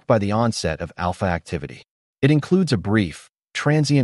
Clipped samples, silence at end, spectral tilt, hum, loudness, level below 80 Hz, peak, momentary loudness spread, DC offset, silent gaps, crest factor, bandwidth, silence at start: under 0.1%; 0 s; -6.5 dB/octave; none; -21 LUFS; -46 dBFS; -4 dBFS; 12 LU; under 0.1%; 1.91-2.14 s; 16 dB; 11.5 kHz; 0.1 s